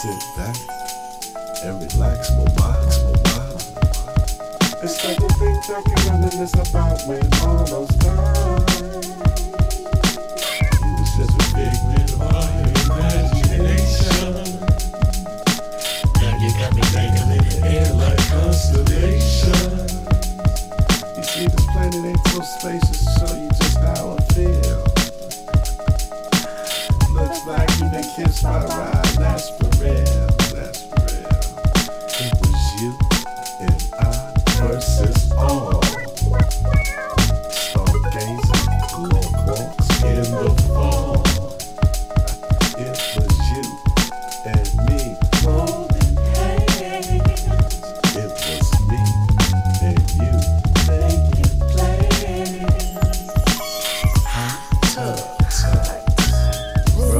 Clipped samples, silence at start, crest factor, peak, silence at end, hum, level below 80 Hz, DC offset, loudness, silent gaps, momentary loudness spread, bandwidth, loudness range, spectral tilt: under 0.1%; 0 s; 16 dB; -2 dBFS; 0 s; none; -20 dBFS; under 0.1%; -19 LUFS; none; 6 LU; 16 kHz; 3 LU; -5 dB/octave